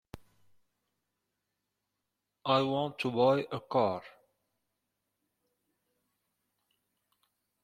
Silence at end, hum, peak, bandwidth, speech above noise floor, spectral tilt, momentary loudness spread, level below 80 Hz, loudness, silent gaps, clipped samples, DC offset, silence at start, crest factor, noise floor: 3.55 s; 50 Hz at -75 dBFS; -12 dBFS; 13.5 kHz; 56 dB; -7 dB/octave; 7 LU; -72 dBFS; -30 LUFS; none; under 0.1%; under 0.1%; 0.15 s; 24 dB; -86 dBFS